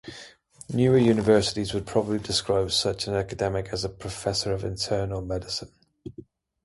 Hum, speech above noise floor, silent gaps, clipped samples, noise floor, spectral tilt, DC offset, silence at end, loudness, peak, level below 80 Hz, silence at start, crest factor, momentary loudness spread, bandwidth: none; 24 dB; none; under 0.1%; -49 dBFS; -5 dB/octave; under 0.1%; 0.4 s; -25 LUFS; -6 dBFS; -48 dBFS; 0.05 s; 20 dB; 16 LU; 11.5 kHz